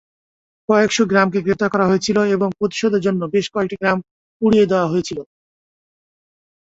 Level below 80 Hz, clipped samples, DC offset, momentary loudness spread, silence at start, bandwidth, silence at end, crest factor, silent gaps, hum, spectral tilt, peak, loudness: -54 dBFS; under 0.1%; under 0.1%; 7 LU; 0.7 s; 8 kHz; 1.4 s; 16 dB; 4.11-4.40 s; none; -5.5 dB/octave; -2 dBFS; -17 LUFS